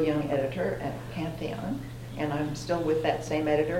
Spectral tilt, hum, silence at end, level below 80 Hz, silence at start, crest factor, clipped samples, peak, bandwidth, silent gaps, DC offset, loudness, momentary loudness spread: -6.5 dB/octave; none; 0 s; -50 dBFS; 0 s; 18 dB; under 0.1%; -12 dBFS; 16.5 kHz; none; under 0.1%; -30 LUFS; 8 LU